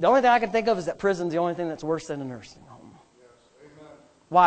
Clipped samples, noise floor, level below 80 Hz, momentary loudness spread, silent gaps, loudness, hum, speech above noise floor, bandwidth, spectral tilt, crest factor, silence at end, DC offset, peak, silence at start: under 0.1%; -57 dBFS; -60 dBFS; 16 LU; none; -25 LUFS; none; 33 dB; 8.8 kHz; -5.5 dB/octave; 20 dB; 0 s; under 0.1%; -6 dBFS; 0 s